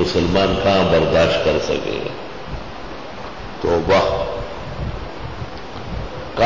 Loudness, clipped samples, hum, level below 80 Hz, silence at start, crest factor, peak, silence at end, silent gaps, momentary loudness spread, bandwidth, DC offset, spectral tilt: -19 LUFS; under 0.1%; none; -34 dBFS; 0 s; 16 dB; -4 dBFS; 0 s; none; 16 LU; 7.6 kHz; 2%; -6 dB/octave